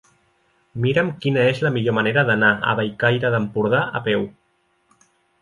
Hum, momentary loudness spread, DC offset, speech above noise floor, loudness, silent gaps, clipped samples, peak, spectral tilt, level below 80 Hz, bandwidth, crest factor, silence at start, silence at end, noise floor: none; 6 LU; under 0.1%; 46 dB; -19 LUFS; none; under 0.1%; -4 dBFS; -7.5 dB/octave; -58 dBFS; 11 kHz; 18 dB; 0.75 s; 1.1 s; -65 dBFS